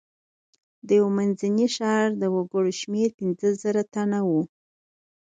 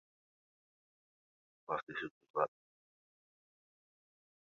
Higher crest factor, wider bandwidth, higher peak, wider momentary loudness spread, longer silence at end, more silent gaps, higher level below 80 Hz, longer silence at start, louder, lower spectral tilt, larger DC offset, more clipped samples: second, 16 dB vs 30 dB; first, 9.2 kHz vs 7 kHz; first, -10 dBFS vs -18 dBFS; about the same, 4 LU vs 6 LU; second, 0.75 s vs 1.95 s; second, 3.14-3.18 s vs 1.83-1.87 s, 2.11-2.21 s, 2.30-2.34 s; first, -72 dBFS vs -86 dBFS; second, 0.85 s vs 1.7 s; first, -24 LUFS vs -41 LUFS; first, -6 dB/octave vs -2.5 dB/octave; neither; neither